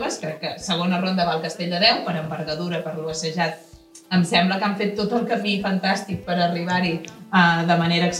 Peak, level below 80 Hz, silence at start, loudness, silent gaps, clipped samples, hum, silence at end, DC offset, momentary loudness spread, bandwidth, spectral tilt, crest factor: -4 dBFS; -58 dBFS; 0 s; -22 LUFS; none; under 0.1%; none; 0 s; under 0.1%; 10 LU; 12.5 kHz; -5 dB/octave; 18 dB